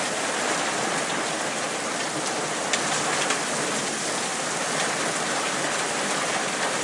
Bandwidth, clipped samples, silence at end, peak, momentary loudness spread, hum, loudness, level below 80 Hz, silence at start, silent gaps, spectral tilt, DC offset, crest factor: 11.5 kHz; under 0.1%; 0 s; -6 dBFS; 3 LU; none; -25 LUFS; -70 dBFS; 0 s; none; -1.5 dB/octave; under 0.1%; 20 dB